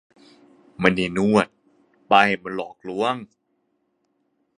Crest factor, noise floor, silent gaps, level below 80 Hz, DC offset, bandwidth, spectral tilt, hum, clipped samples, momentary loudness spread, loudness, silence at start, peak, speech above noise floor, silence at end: 24 dB; -71 dBFS; none; -56 dBFS; under 0.1%; 10.5 kHz; -5.5 dB/octave; none; under 0.1%; 14 LU; -21 LUFS; 0.8 s; 0 dBFS; 50 dB; 1.35 s